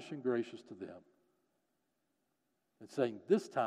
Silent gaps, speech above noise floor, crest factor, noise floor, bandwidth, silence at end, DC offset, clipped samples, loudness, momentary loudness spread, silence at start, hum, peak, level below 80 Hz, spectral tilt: none; 46 dB; 22 dB; -83 dBFS; 11.5 kHz; 0 s; under 0.1%; under 0.1%; -37 LUFS; 17 LU; 0 s; none; -18 dBFS; under -90 dBFS; -6.5 dB/octave